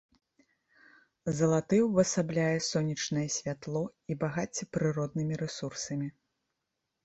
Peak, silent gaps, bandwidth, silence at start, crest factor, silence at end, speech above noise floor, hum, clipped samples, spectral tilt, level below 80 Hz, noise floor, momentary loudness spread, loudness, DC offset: -12 dBFS; none; 8.2 kHz; 1.25 s; 20 dB; 0.95 s; 54 dB; none; under 0.1%; -5 dB/octave; -66 dBFS; -84 dBFS; 10 LU; -31 LUFS; under 0.1%